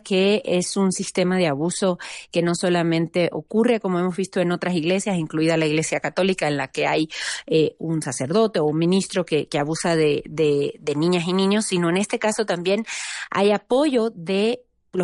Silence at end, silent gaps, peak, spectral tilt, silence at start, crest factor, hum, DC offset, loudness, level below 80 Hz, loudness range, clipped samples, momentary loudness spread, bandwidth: 0 s; none; -8 dBFS; -5 dB/octave; 0.05 s; 14 dB; none; under 0.1%; -22 LUFS; -62 dBFS; 1 LU; under 0.1%; 5 LU; 11.5 kHz